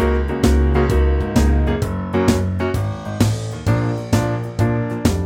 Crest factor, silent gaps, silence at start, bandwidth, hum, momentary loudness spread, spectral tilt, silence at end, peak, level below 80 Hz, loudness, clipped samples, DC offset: 14 dB; none; 0 s; 16.5 kHz; none; 5 LU; -7 dB/octave; 0 s; -4 dBFS; -22 dBFS; -19 LUFS; under 0.1%; under 0.1%